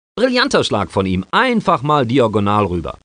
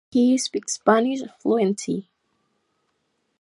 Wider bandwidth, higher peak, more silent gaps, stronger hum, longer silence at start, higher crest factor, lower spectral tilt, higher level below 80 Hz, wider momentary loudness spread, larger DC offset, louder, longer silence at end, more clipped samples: second, 10 kHz vs 11.5 kHz; about the same, 0 dBFS vs -2 dBFS; neither; neither; about the same, 0.15 s vs 0.15 s; second, 16 dB vs 22 dB; about the same, -5.5 dB/octave vs -4.5 dB/octave; first, -44 dBFS vs -74 dBFS; second, 4 LU vs 9 LU; neither; first, -16 LUFS vs -22 LUFS; second, 0.15 s vs 1.4 s; neither